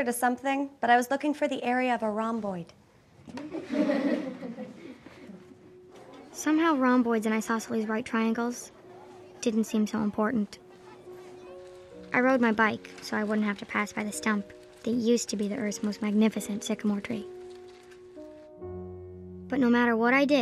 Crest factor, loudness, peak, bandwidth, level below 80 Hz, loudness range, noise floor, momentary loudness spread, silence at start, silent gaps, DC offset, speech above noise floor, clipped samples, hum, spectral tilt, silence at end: 20 dB; -28 LUFS; -8 dBFS; 14.5 kHz; -70 dBFS; 6 LU; -52 dBFS; 23 LU; 0 s; none; under 0.1%; 25 dB; under 0.1%; none; -5 dB/octave; 0 s